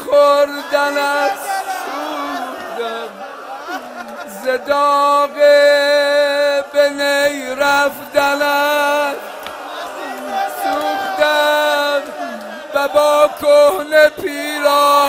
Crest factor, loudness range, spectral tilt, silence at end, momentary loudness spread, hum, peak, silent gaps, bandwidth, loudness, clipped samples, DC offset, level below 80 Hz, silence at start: 16 dB; 7 LU; -1.5 dB/octave; 0 s; 15 LU; none; 0 dBFS; none; 16.5 kHz; -15 LUFS; under 0.1%; under 0.1%; -58 dBFS; 0 s